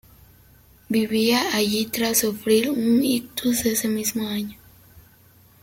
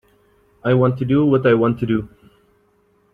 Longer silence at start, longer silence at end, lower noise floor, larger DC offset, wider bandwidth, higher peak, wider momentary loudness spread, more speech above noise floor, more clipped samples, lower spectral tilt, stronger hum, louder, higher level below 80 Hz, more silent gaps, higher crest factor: first, 0.9 s vs 0.65 s; second, 0.65 s vs 1.05 s; second, -53 dBFS vs -59 dBFS; neither; first, 17 kHz vs 4.7 kHz; second, -6 dBFS vs -2 dBFS; second, 6 LU vs 9 LU; second, 32 dB vs 43 dB; neither; second, -3 dB/octave vs -10 dB/octave; neither; second, -22 LUFS vs -17 LUFS; second, -56 dBFS vs -50 dBFS; neither; about the same, 18 dB vs 16 dB